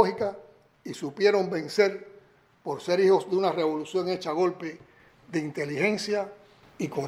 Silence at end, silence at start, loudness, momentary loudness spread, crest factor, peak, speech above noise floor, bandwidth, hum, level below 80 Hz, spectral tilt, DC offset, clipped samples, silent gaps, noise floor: 0 s; 0 s; -27 LUFS; 16 LU; 22 dB; -6 dBFS; 31 dB; 12.5 kHz; none; -72 dBFS; -5.5 dB/octave; under 0.1%; under 0.1%; none; -58 dBFS